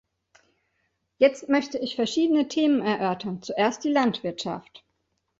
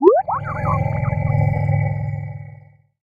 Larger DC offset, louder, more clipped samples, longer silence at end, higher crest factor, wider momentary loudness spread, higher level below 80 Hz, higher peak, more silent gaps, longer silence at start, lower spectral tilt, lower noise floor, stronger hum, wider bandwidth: neither; second, -25 LUFS vs -20 LUFS; neither; first, 0.8 s vs 0.5 s; about the same, 20 dB vs 20 dB; second, 9 LU vs 12 LU; second, -68 dBFS vs -38 dBFS; second, -6 dBFS vs 0 dBFS; neither; first, 1.2 s vs 0 s; second, -5 dB/octave vs -11.5 dB/octave; first, -75 dBFS vs -45 dBFS; neither; first, 7.8 kHz vs 2.9 kHz